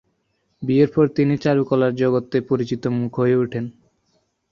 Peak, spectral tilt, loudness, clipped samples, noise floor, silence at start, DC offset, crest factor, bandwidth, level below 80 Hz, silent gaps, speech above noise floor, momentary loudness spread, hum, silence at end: -4 dBFS; -8.5 dB/octave; -20 LUFS; under 0.1%; -69 dBFS; 0.6 s; under 0.1%; 16 dB; 7.2 kHz; -58 dBFS; none; 50 dB; 7 LU; none; 0.8 s